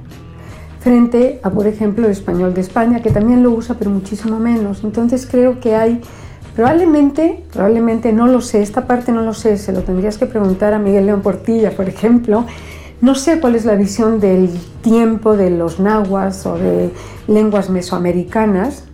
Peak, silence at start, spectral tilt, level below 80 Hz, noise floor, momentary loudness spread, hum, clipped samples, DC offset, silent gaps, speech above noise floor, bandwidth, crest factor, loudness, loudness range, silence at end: -2 dBFS; 0 s; -7 dB/octave; -36 dBFS; -33 dBFS; 7 LU; none; under 0.1%; under 0.1%; none; 20 dB; 14 kHz; 10 dB; -14 LUFS; 2 LU; 0 s